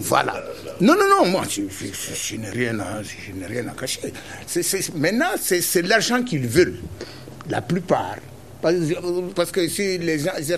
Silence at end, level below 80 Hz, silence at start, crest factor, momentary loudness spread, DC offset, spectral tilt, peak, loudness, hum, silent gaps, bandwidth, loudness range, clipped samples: 0 s; -52 dBFS; 0 s; 20 dB; 15 LU; 0.4%; -4 dB/octave; -2 dBFS; -22 LUFS; none; none; 14 kHz; 5 LU; under 0.1%